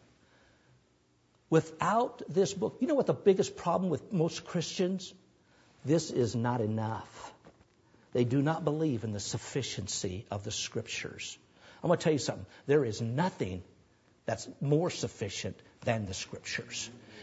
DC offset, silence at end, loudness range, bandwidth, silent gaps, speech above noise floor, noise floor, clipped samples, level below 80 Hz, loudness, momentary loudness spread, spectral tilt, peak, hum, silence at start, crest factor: under 0.1%; 0 s; 5 LU; 8 kHz; none; 37 dB; -69 dBFS; under 0.1%; -66 dBFS; -32 LUFS; 11 LU; -5.5 dB/octave; -12 dBFS; none; 1.5 s; 20 dB